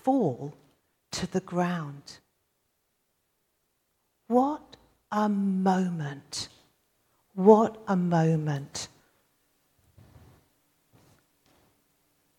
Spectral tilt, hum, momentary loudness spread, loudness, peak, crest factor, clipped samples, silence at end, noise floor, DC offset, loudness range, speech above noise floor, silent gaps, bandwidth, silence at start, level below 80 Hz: -6.5 dB/octave; none; 19 LU; -27 LUFS; -4 dBFS; 24 dB; under 0.1%; 3.55 s; -76 dBFS; under 0.1%; 10 LU; 50 dB; none; 13 kHz; 0.05 s; -68 dBFS